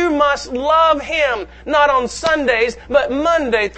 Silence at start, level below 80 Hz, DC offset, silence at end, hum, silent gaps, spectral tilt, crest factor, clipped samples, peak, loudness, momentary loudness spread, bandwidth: 0 s; -40 dBFS; under 0.1%; 0 s; none; none; -3.5 dB/octave; 16 dB; under 0.1%; 0 dBFS; -16 LUFS; 5 LU; 8.8 kHz